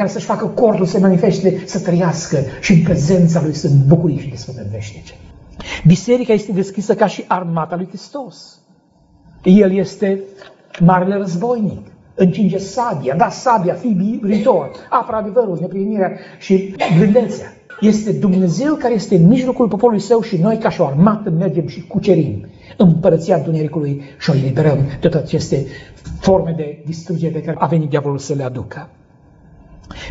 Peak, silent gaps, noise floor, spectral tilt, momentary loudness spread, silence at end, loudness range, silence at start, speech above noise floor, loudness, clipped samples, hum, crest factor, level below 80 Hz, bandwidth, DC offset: 0 dBFS; none; -52 dBFS; -7.5 dB/octave; 15 LU; 0 s; 4 LU; 0 s; 38 dB; -15 LUFS; under 0.1%; none; 16 dB; -44 dBFS; 8 kHz; under 0.1%